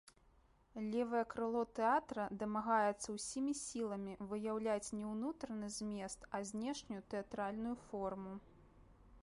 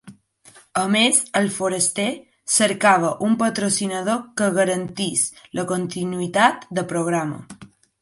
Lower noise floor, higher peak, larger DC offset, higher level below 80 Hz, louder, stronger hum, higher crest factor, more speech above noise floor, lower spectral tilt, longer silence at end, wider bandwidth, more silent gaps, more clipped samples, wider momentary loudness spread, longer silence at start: first, -70 dBFS vs -51 dBFS; second, -22 dBFS vs -2 dBFS; neither; about the same, -68 dBFS vs -64 dBFS; second, -41 LUFS vs -20 LUFS; neither; about the same, 18 dB vs 20 dB; about the same, 29 dB vs 30 dB; first, -4.5 dB/octave vs -3 dB/octave; second, 0.05 s vs 0.35 s; about the same, 11.5 kHz vs 12 kHz; neither; neither; about the same, 10 LU vs 10 LU; first, 0.75 s vs 0.05 s